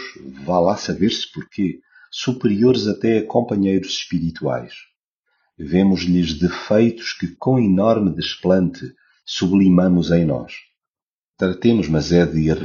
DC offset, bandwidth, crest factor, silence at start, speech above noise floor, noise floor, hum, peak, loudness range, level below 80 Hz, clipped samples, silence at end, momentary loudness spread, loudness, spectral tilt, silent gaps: under 0.1%; 7.2 kHz; 18 dB; 0 s; over 72 dB; under -90 dBFS; none; -2 dBFS; 3 LU; -44 dBFS; under 0.1%; 0 s; 13 LU; -18 LUFS; -6 dB/octave; 4.96-5.23 s, 10.89-10.94 s, 11.02-11.34 s